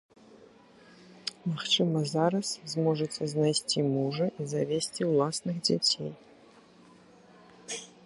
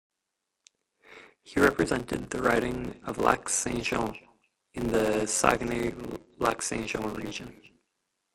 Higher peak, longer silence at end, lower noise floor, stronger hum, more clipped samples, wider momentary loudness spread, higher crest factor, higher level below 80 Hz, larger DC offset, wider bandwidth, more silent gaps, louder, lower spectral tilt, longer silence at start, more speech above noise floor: second, -12 dBFS vs -4 dBFS; second, 0.15 s vs 0.8 s; second, -56 dBFS vs -84 dBFS; neither; neither; about the same, 13 LU vs 13 LU; second, 20 dB vs 26 dB; second, -74 dBFS vs -50 dBFS; neither; second, 11.5 kHz vs 16.5 kHz; neither; about the same, -29 LUFS vs -28 LUFS; about the same, -4.5 dB/octave vs -4 dB/octave; second, 0.3 s vs 1.1 s; second, 28 dB vs 55 dB